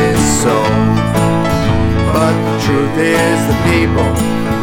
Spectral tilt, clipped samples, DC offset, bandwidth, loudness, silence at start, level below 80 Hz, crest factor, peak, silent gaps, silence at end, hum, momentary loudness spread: -5.5 dB/octave; under 0.1%; under 0.1%; 18.5 kHz; -13 LUFS; 0 s; -26 dBFS; 12 dB; 0 dBFS; none; 0 s; none; 2 LU